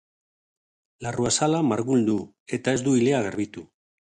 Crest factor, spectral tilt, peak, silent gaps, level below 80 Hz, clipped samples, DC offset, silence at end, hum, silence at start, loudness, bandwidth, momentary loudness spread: 16 dB; -5 dB/octave; -8 dBFS; 2.40-2.46 s; -60 dBFS; under 0.1%; under 0.1%; 0.5 s; none; 1 s; -24 LUFS; 10 kHz; 12 LU